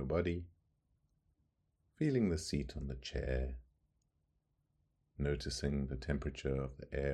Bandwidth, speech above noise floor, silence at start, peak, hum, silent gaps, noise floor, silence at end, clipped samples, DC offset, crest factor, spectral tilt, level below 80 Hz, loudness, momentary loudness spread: 12 kHz; 43 dB; 0 s; -20 dBFS; none; none; -81 dBFS; 0 s; under 0.1%; under 0.1%; 20 dB; -6 dB/octave; -48 dBFS; -39 LUFS; 9 LU